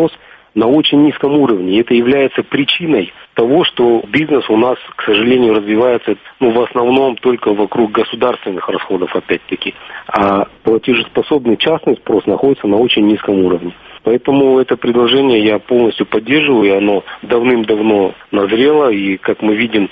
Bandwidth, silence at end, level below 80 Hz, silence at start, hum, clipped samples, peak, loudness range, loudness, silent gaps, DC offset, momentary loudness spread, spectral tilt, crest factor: 5 kHz; 0.05 s; -50 dBFS; 0 s; none; under 0.1%; 0 dBFS; 3 LU; -13 LUFS; none; under 0.1%; 7 LU; -8 dB/octave; 12 dB